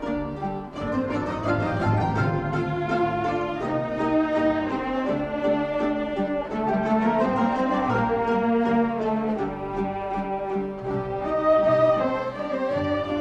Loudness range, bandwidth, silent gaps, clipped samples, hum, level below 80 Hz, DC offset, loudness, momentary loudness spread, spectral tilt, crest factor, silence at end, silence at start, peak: 2 LU; 8.6 kHz; none; under 0.1%; none; -46 dBFS; under 0.1%; -25 LUFS; 7 LU; -8 dB/octave; 14 dB; 0 s; 0 s; -10 dBFS